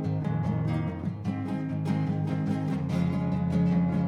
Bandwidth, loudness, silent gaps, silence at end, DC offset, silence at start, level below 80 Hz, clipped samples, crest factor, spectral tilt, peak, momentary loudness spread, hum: 7 kHz; -29 LUFS; none; 0 s; under 0.1%; 0 s; -52 dBFS; under 0.1%; 12 dB; -9 dB/octave; -16 dBFS; 7 LU; none